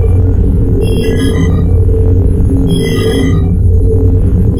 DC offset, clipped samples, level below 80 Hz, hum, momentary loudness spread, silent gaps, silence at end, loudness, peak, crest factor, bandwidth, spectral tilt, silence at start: under 0.1%; under 0.1%; -12 dBFS; none; 2 LU; none; 0 s; -10 LUFS; 0 dBFS; 8 dB; 13.5 kHz; -8 dB/octave; 0 s